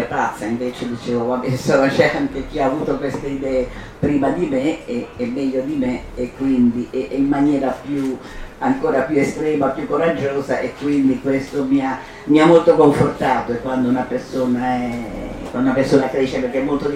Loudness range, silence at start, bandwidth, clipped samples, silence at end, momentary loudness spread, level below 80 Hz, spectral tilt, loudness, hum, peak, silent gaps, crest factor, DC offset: 5 LU; 0 s; 13.5 kHz; under 0.1%; 0 s; 10 LU; -40 dBFS; -6.5 dB/octave; -19 LUFS; none; -2 dBFS; none; 16 dB; under 0.1%